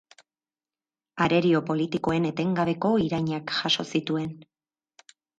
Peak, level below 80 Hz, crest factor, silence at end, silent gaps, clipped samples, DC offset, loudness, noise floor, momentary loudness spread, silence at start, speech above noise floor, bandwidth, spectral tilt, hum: -8 dBFS; -60 dBFS; 18 dB; 0.95 s; none; under 0.1%; under 0.1%; -25 LUFS; under -90 dBFS; 7 LU; 1.15 s; over 65 dB; 9 kHz; -6 dB/octave; none